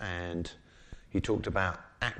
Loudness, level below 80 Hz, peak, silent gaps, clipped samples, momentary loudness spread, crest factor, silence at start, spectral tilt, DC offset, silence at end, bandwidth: -34 LUFS; -48 dBFS; -12 dBFS; none; under 0.1%; 17 LU; 22 dB; 0 s; -5.5 dB/octave; under 0.1%; 0 s; 9.8 kHz